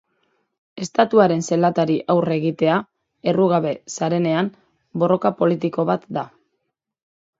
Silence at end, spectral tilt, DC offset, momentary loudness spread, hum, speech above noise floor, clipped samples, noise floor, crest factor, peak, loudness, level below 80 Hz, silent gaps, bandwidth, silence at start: 1.15 s; -6.5 dB/octave; under 0.1%; 10 LU; none; 57 dB; under 0.1%; -76 dBFS; 20 dB; 0 dBFS; -20 LUFS; -66 dBFS; none; 7.8 kHz; 0.75 s